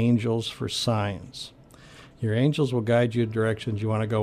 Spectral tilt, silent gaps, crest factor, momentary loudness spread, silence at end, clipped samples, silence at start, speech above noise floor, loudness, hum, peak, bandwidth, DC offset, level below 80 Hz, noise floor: -6.5 dB/octave; none; 16 dB; 12 LU; 0 s; under 0.1%; 0 s; 25 dB; -26 LUFS; none; -10 dBFS; 13.5 kHz; under 0.1%; -56 dBFS; -49 dBFS